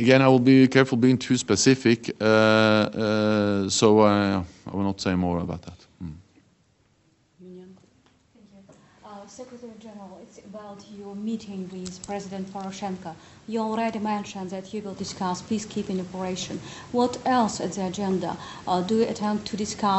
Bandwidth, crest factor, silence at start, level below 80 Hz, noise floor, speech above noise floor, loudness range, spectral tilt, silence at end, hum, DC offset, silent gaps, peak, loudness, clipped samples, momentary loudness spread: 8.2 kHz; 22 dB; 0 s; -58 dBFS; -64 dBFS; 41 dB; 20 LU; -5 dB/octave; 0 s; none; under 0.1%; none; -2 dBFS; -24 LUFS; under 0.1%; 24 LU